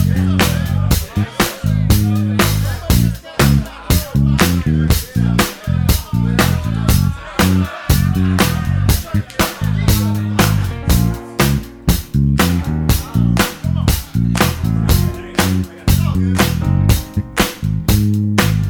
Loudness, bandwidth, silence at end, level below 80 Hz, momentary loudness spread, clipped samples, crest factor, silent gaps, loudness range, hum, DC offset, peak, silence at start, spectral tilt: -16 LUFS; over 20 kHz; 0 s; -22 dBFS; 4 LU; under 0.1%; 14 dB; none; 1 LU; none; under 0.1%; 0 dBFS; 0 s; -5.5 dB/octave